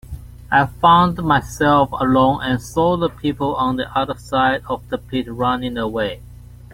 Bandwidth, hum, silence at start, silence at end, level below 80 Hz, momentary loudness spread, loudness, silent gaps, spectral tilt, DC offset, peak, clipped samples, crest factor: 16.5 kHz; 60 Hz at -35 dBFS; 0.05 s; 0.1 s; -40 dBFS; 11 LU; -18 LUFS; none; -6 dB/octave; under 0.1%; 0 dBFS; under 0.1%; 18 dB